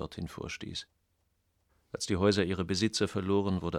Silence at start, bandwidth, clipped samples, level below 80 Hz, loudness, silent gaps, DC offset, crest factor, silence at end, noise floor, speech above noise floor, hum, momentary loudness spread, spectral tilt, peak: 0 s; 14 kHz; under 0.1%; -56 dBFS; -31 LUFS; none; under 0.1%; 20 dB; 0 s; -76 dBFS; 44 dB; none; 13 LU; -5 dB/octave; -14 dBFS